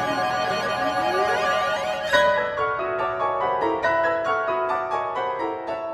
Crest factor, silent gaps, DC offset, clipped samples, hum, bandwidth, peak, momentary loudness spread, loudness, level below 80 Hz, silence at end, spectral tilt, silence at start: 16 dB; none; under 0.1%; under 0.1%; none; 16 kHz; -6 dBFS; 5 LU; -23 LUFS; -56 dBFS; 0 s; -3.5 dB/octave; 0 s